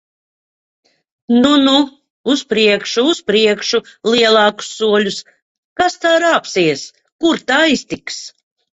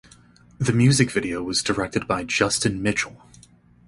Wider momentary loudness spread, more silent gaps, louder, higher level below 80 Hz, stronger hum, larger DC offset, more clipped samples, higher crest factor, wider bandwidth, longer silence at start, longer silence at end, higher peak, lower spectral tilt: first, 14 LU vs 8 LU; first, 2.10-2.24 s, 5.42-5.76 s, 7.12-7.19 s vs none; first, -14 LUFS vs -22 LUFS; second, -56 dBFS vs -48 dBFS; neither; neither; neither; about the same, 16 dB vs 20 dB; second, 8.2 kHz vs 11.5 kHz; first, 1.3 s vs 0.6 s; second, 0.45 s vs 0.7 s; first, 0 dBFS vs -4 dBFS; about the same, -3.5 dB/octave vs -4.5 dB/octave